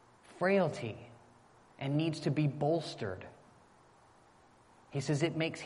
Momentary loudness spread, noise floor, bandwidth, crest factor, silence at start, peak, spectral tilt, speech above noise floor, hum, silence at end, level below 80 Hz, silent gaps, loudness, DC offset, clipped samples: 15 LU; -63 dBFS; 11.5 kHz; 20 dB; 0.3 s; -16 dBFS; -6.5 dB/octave; 30 dB; none; 0 s; -72 dBFS; none; -34 LUFS; under 0.1%; under 0.1%